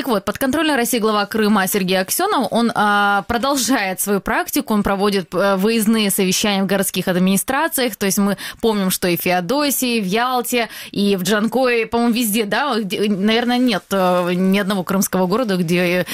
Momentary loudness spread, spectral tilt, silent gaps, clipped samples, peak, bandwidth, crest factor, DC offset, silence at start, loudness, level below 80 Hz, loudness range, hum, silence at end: 3 LU; -4 dB/octave; none; under 0.1%; -6 dBFS; 16.5 kHz; 12 dB; under 0.1%; 0 s; -17 LUFS; -48 dBFS; 1 LU; none; 0 s